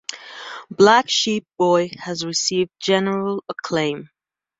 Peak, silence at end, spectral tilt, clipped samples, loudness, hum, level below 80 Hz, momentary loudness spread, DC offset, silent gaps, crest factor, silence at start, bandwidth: 0 dBFS; 0.55 s; -3.5 dB/octave; under 0.1%; -19 LUFS; none; -64 dBFS; 19 LU; under 0.1%; none; 20 dB; 0.1 s; 7.8 kHz